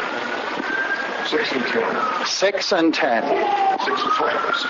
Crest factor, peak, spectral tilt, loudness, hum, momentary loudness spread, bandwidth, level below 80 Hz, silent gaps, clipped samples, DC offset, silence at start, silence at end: 14 dB; -8 dBFS; -2.5 dB/octave; -20 LUFS; none; 5 LU; 7.6 kHz; -64 dBFS; none; under 0.1%; under 0.1%; 0 s; 0 s